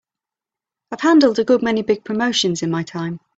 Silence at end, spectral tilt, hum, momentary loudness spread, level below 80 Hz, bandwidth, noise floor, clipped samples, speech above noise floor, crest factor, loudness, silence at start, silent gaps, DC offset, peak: 0.2 s; -4.5 dB/octave; none; 12 LU; -60 dBFS; 8 kHz; -88 dBFS; under 0.1%; 70 dB; 16 dB; -18 LUFS; 0.9 s; none; under 0.1%; -2 dBFS